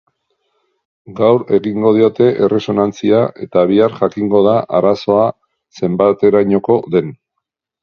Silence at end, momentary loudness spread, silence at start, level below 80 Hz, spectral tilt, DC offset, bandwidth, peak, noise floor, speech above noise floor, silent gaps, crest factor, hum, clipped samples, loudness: 0.7 s; 6 LU; 1.1 s; -54 dBFS; -8 dB/octave; under 0.1%; 6.8 kHz; 0 dBFS; -76 dBFS; 63 dB; none; 14 dB; none; under 0.1%; -13 LUFS